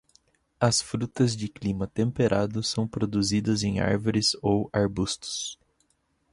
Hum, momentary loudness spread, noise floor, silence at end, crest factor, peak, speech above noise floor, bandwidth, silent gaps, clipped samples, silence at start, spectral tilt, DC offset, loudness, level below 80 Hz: none; 7 LU; -71 dBFS; 0.8 s; 20 dB; -8 dBFS; 45 dB; 11.5 kHz; none; under 0.1%; 0.6 s; -5 dB/octave; under 0.1%; -26 LUFS; -50 dBFS